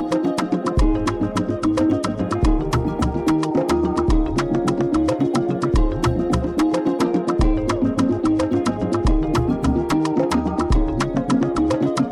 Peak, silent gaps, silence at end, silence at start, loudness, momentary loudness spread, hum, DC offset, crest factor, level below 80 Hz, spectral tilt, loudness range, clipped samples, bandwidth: -8 dBFS; none; 0 s; 0 s; -20 LUFS; 2 LU; none; under 0.1%; 10 dB; -26 dBFS; -7 dB/octave; 1 LU; under 0.1%; 13 kHz